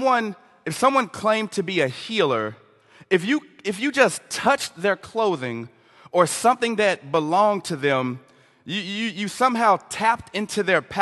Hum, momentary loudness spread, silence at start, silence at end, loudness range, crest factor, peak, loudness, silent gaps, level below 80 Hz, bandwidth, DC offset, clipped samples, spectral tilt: none; 11 LU; 0 s; 0 s; 1 LU; 20 dB; -2 dBFS; -22 LUFS; none; -64 dBFS; 12.5 kHz; under 0.1%; under 0.1%; -4 dB/octave